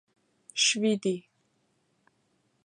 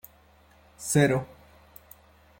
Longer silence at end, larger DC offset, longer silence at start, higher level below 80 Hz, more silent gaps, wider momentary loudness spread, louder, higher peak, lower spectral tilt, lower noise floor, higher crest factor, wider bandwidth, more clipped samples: first, 1.45 s vs 1.15 s; neither; second, 0.55 s vs 0.8 s; second, -82 dBFS vs -60 dBFS; neither; second, 13 LU vs 27 LU; about the same, -27 LUFS vs -25 LUFS; about the same, -12 dBFS vs -10 dBFS; second, -2.5 dB/octave vs -5 dB/octave; first, -72 dBFS vs -58 dBFS; about the same, 20 dB vs 22 dB; second, 11 kHz vs 16.5 kHz; neither